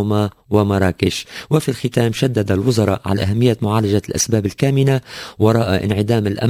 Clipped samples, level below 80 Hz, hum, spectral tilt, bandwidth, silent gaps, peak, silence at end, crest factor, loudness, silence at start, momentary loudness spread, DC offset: under 0.1%; -36 dBFS; none; -6 dB/octave; 16 kHz; none; 0 dBFS; 0 s; 16 dB; -17 LUFS; 0 s; 4 LU; under 0.1%